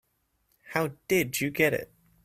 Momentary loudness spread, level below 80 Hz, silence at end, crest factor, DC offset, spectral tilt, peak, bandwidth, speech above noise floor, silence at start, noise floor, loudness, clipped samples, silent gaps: 9 LU; -64 dBFS; 0.4 s; 22 dB; under 0.1%; -4.5 dB/octave; -8 dBFS; 16 kHz; 45 dB; 0.65 s; -73 dBFS; -28 LUFS; under 0.1%; none